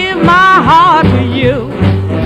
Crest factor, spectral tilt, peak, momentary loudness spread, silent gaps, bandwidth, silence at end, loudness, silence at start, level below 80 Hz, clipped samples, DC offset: 8 dB; -7 dB/octave; 0 dBFS; 7 LU; none; 9.6 kHz; 0 s; -8 LUFS; 0 s; -30 dBFS; 0.6%; under 0.1%